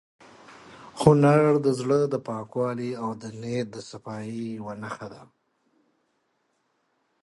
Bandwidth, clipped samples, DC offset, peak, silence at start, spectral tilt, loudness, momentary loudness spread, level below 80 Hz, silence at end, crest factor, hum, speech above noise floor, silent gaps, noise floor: 11.5 kHz; under 0.1%; under 0.1%; -4 dBFS; 0.5 s; -7.5 dB/octave; -25 LUFS; 19 LU; -62 dBFS; 2 s; 22 dB; none; 48 dB; none; -73 dBFS